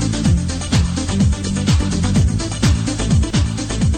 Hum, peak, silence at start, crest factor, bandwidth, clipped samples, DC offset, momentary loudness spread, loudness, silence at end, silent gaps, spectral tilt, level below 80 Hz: none; -4 dBFS; 0 s; 12 dB; 10 kHz; under 0.1%; under 0.1%; 3 LU; -17 LUFS; 0 s; none; -5.5 dB/octave; -22 dBFS